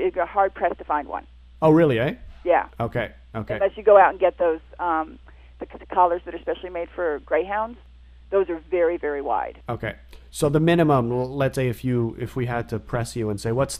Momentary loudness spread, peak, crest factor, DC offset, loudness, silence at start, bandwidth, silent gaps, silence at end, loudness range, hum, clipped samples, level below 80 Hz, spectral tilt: 14 LU; -2 dBFS; 20 dB; under 0.1%; -23 LUFS; 0 s; 15.5 kHz; none; 0 s; 5 LU; none; under 0.1%; -46 dBFS; -6.5 dB/octave